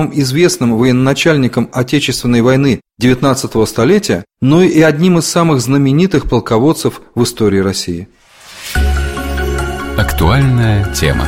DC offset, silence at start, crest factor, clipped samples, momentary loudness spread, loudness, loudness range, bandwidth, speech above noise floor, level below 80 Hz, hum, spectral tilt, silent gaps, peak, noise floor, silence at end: under 0.1%; 0 s; 12 dB; under 0.1%; 8 LU; -12 LUFS; 5 LU; 16.5 kHz; 20 dB; -24 dBFS; none; -5.5 dB/octave; none; 0 dBFS; -31 dBFS; 0 s